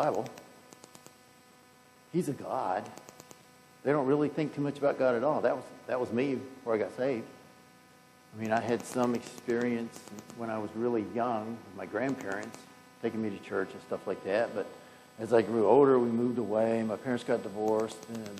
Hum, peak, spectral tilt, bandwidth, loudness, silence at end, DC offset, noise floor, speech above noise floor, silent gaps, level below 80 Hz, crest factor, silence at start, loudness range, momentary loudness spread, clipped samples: none; -10 dBFS; -6.5 dB/octave; 14.5 kHz; -31 LUFS; 0 s; under 0.1%; -59 dBFS; 28 dB; none; -80 dBFS; 22 dB; 0 s; 8 LU; 15 LU; under 0.1%